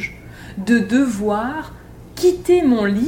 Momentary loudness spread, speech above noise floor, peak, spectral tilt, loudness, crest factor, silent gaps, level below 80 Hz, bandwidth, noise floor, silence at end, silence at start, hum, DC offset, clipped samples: 20 LU; 20 dB; -4 dBFS; -6 dB/octave; -18 LUFS; 14 dB; none; -44 dBFS; 17 kHz; -36 dBFS; 0 s; 0 s; none; under 0.1%; under 0.1%